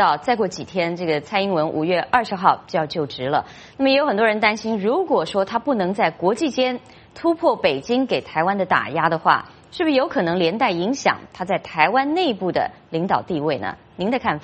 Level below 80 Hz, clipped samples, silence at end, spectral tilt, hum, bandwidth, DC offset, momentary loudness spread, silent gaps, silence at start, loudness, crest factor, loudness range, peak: -58 dBFS; under 0.1%; 0 s; -5.5 dB/octave; none; 8.4 kHz; under 0.1%; 7 LU; none; 0 s; -20 LUFS; 20 dB; 1 LU; 0 dBFS